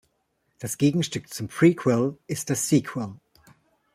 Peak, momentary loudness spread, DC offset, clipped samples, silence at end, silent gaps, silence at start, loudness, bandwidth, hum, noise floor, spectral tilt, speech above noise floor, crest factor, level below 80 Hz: -6 dBFS; 13 LU; under 0.1%; under 0.1%; 0.8 s; none; 0.6 s; -24 LUFS; 16 kHz; none; -73 dBFS; -5.5 dB/octave; 49 dB; 20 dB; -64 dBFS